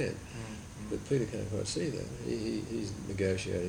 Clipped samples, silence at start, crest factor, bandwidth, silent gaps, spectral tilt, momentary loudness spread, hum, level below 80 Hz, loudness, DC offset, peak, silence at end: under 0.1%; 0 s; 16 dB; 17.5 kHz; none; -5.5 dB/octave; 10 LU; none; -54 dBFS; -36 LUFS; under 0.1%; -18 dBFS; 0 s